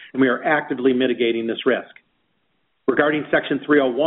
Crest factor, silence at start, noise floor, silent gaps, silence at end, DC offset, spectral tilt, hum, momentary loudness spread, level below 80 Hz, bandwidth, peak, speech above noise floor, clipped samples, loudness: 18 dB; 0 s; -70 dBFS; none; 0 s; under 0.1%; -3 dB/octave; none; 4 LU; -62 dBFS; 4.1 kHz; -2 dBFS; 51 dB; under 0.1%; -20 LUFS